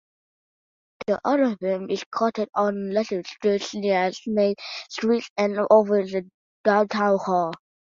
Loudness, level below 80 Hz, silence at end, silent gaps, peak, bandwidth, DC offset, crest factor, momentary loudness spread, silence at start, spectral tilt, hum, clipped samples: -23 LUFS; -68 dBFS; 0.4 s; 2.06-2.11 s, 5.30-5.36 s, 6.34-6.64 s; -4 dBFS; 7.6 kHz; under 0.1%; 20 dB; 10 LU; 1 s; -5.5 dB/octave; none; under 0.1%